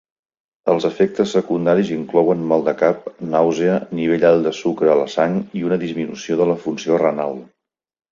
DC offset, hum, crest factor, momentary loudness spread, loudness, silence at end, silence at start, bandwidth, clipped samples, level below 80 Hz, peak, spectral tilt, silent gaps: under 0.1%; none; 16 dB; 6 LU; -18 LUFS; 0.65 s; 0.65 s; 7.6 kHz; under 0.1%; -60 dBFS; -2 dBFS; -6.5 dB/octave; none